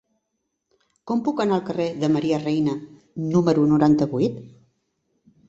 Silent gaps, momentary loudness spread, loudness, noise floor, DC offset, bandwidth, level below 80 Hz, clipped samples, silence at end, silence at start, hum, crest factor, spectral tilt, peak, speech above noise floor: none; 11 LU; -22 LUFS; -77 dBFS; under 0.1%; 7.8 kHz; -58 dBFS; under 0.1%; 1 s; 1.05 s; none; 18 dB; -8 dB/octave; -6 dBFS; 57 dB